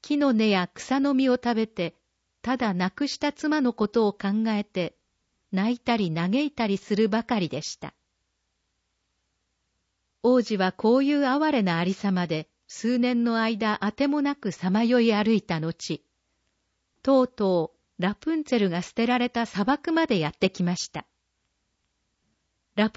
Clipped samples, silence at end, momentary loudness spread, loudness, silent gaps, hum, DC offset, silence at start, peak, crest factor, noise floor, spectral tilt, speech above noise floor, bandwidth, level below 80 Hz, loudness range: under 0.1%; 0.05 s; 10 LU; -25 LUFS; none; none; under 0.1%; 0 s; -10 dBFS; 16 dB; -76 dBFS; -6 dB/octave; 52 dB; 8 kHz; -64 dBFS; 4 LU